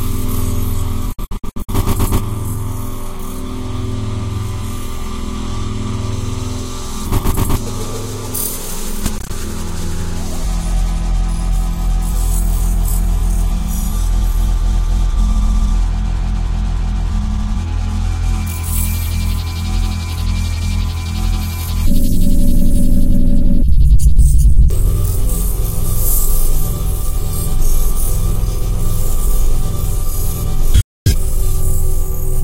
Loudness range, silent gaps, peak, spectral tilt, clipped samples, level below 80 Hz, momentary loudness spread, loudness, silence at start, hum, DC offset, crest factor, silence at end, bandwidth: 7 LU; 30.84-31.05 s; 0 dBFS; -5.5 dB/octave; under 0.1%; -14 dBFS; 8 LU; -19 LUFS; 0 s; none; under 0.1%; 12 dB; 0 s; 16 kHz